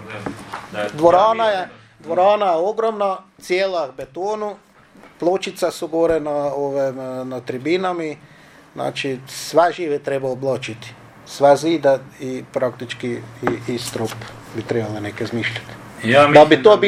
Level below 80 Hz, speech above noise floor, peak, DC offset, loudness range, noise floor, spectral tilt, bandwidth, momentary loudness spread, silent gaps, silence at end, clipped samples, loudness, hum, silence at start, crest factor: -56 dBFS; 28 dB; 0 dBFS; under 0.1%; 6 LU; -47 dBFS; -5 dB/octave; 15 kHz; 16 LU; none; 0 s; under 0.1%; -19 LUFS; none; 0 s; 18 dB